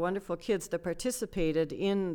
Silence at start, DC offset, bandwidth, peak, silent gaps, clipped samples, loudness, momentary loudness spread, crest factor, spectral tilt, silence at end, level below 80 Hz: 0 s; under 0.1%; 20 kHz; -18 dBFS; none; under 0.1%; -32 LUFS; 4 LU; 14 dB; -5 dB/octave; 0 s; -50 dBFS